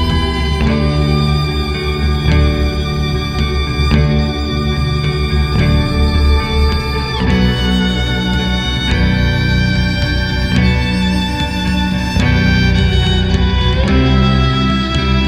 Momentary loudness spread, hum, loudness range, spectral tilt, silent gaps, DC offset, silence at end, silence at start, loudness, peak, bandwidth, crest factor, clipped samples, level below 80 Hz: 5 LU; none; 2 LU; -6.5 dB/octave; none; under 0.1%; 0 s; 0 s; -14 LUFS; 0 dBFS; 13.5 kHz; 12 dB; under 0.1%; -18 dBFS